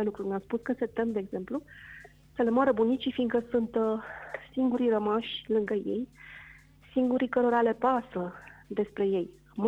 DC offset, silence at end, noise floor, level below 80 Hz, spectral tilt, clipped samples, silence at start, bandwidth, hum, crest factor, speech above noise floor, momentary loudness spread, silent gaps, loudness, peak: under 0.1%; 0 s; -54 dBFS; -62 dBFS; -7.5 dB/octave; under 0.1%; 0 s; 7.6 kHz; none; 16 dB; 25 dB; 16 LU; none; -29 LUFS; -12 dBFS